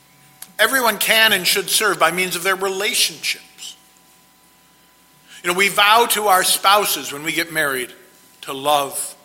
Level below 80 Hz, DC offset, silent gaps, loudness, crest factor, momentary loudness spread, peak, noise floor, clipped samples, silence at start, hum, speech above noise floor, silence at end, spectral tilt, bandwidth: -64 dBFS; under 0.1%; none; -16 LUFS; 20 dB; 15 LU; 0 dBFS; -53 dBFS; under 0.1%; 0.6 s; none; 35 dB; 0.1 s; -1 dB/octave; 16.5 kHz